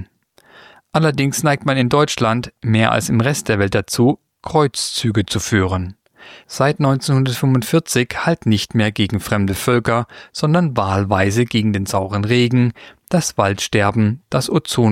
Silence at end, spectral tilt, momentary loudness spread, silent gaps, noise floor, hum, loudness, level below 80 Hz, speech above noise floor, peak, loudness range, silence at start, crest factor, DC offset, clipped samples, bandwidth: 0 s; -5.5 dB/octave; 5 LU; none; -52 dBFS; none; -17 LUFS; -46 dBFS; 36 dB; -2 dBFS; 2 LU; 0 s; 16 dB; under 0.1%; under 0.1%; 16.5 kHz